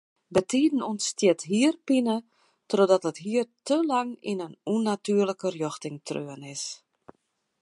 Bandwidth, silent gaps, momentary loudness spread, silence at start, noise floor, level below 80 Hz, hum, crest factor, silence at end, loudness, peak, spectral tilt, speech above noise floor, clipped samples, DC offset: 11.5 kHz; none; 11 LU; 0.3 s; -75 dBFS; -70 dBFS; none; 20 dB; 0.85 s; -27 LUFS; -8 dBFS; -4.5 dB/octave; 49 dB; under 0.1%; under 0.1%